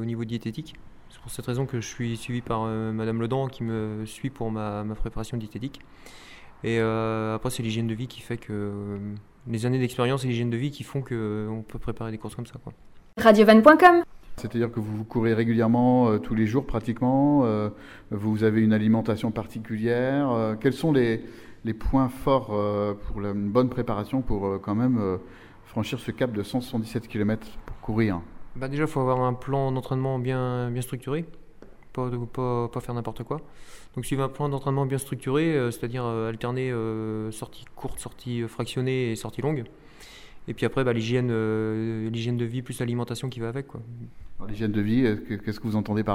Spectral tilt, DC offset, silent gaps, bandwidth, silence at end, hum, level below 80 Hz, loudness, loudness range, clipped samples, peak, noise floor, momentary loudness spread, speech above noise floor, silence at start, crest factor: -7 dB/octave; under 0.1%; none; 16 kHz; 0 s; none; -44 dBFS; -26 LUFS; 11 LU; under 0.1%; 0 dBFS; -46 dBFS; 14 LU; 21 dB; 0 s; 26 dB